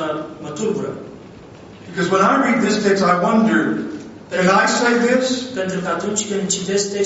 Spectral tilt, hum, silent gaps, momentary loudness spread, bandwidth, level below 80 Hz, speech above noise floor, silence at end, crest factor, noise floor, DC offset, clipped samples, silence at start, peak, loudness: -4 dB/octave; none; none; 14 LU; 8.2 kHz; -58 dBFS; 22 dB; 0 s; 18 dB; -39 dBFS; under 0.1%; under 0.1%; 0 s; -2 dBFS; -17 LUFS